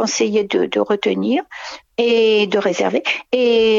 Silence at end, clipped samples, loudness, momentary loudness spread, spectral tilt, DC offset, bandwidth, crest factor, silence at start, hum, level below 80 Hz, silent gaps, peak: 0 s; under 0.1%; -17 LUFS; 7 LU; -3.5 dB/octave; under 0.1%; 7.6 kHz; 14 dB; 0 s; none; -60 dBFS; none; -4 dBFS